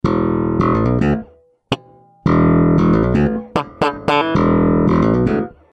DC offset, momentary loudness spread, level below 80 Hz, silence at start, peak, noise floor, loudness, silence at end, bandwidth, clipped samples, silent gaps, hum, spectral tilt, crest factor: under 0.1%; 10 LU; -32 dBFS; 0.05 s; 0 dBFS; -45 dBFS; -16 LUFS; 0.25 s; 8.4 kHz; under 0.1%; none; none; -8.5 dB/octave; 16 dB